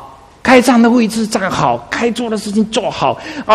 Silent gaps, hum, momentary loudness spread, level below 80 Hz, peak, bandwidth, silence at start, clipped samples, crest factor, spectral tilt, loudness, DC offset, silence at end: none; none; 8 LU; -46 dBFS; 0 dBFS; 14 kHz; 0 s; 0.1%; 14 dB; -4.5 dB/octave; -13 LUFS; under 0.1%; 0 s